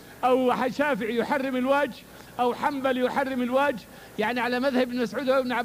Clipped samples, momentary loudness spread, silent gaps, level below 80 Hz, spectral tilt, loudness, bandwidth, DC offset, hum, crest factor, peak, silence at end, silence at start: under 0.1%; 6 LU; none; -60 dBFS; -5 dB/octave; -25 LUFS; 15.5 kHz; under 0.1%; none; 14 dB; -10 dBFS; 0 s; 0 s